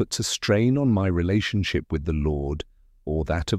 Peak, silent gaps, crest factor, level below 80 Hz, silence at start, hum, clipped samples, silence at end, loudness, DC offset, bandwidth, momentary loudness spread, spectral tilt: -10 dBFS; none; 14 dB; -36 dBFS; 0 s; none; under 0.1%; 0 s; -24 LUFS; under 0.1%; 15 kHz; 10 LU; -5.5 dB/octave